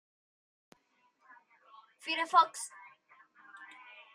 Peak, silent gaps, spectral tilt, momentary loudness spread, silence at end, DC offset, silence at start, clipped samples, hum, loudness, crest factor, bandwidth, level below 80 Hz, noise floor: -12 dBFS; none; 0.5 dB/octave; 27 LU; 0.5 s; under 0.1%; 2.05 s; under 0.1%; none; -31 LUFS; 26 dB; 14.5 kHz; under -90 dBFS; -73 dBFS